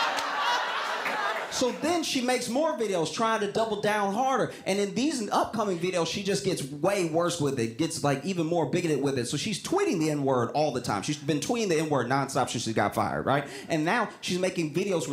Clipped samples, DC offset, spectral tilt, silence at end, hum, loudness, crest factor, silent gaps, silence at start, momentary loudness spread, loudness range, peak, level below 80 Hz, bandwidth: under 0.1%; under 0.1%; -4.5 dB/octave; 0 s; none; -28 LUFS; 16 dB; none; 0 s; 3 LU; 1 LU; -10 dBFS; -64 dBFS; 16 kHz